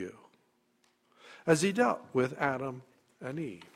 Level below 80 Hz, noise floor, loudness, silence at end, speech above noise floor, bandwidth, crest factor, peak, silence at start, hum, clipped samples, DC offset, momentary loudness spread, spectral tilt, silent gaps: -72 dBFS; -72 dBFS; -31 LUFS; 0.1 s; 41 dB; 15 kHz; 22 dB; -12 dBFS; 0 s; none; under 0.1%; under 0.1%; 16 LU; -5 dB/octave; none